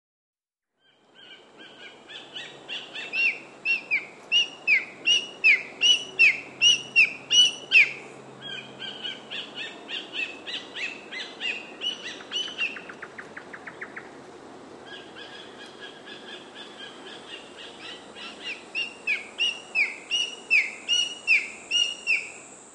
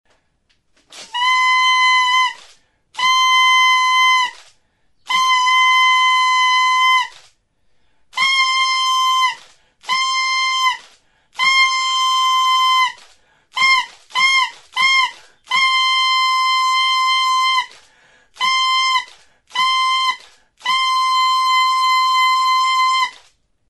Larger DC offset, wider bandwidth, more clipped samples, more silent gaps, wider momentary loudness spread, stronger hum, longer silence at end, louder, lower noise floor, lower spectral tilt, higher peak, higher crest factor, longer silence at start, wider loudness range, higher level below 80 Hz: neither; second, 10.5 kHz vs 12 kHz; neither; neither; first, 23 LU vs 9 LU; neither; second, 0.05 s vs 0.55 s; second, -23 LUFS vs -14 LUFS; first, -78 dBFS vs -63 dBFS; first, 1 dB/octave vs 4 dB/octave; about the same, -6 dBFS vs -4 dBFS; first, 22 dB vs 12 dB; first, 1.2 s vs 0.9 s; first, 22 LU vs 3 LU; second, -78 dBFS vs -68 dBFS